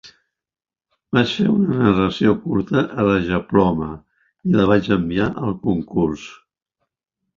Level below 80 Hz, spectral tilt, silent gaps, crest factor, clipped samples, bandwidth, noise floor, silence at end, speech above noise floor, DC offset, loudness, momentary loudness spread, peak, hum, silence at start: -44 dBFS; -7.5 dB/octave; none; 18 dB; under 0.1%; 7.4 kHz; -79 dBFS; 1.05 s; 61 dB; under 0.1%; -19 LUFS; 9 LU; -2 dBFS; none; 0.05 s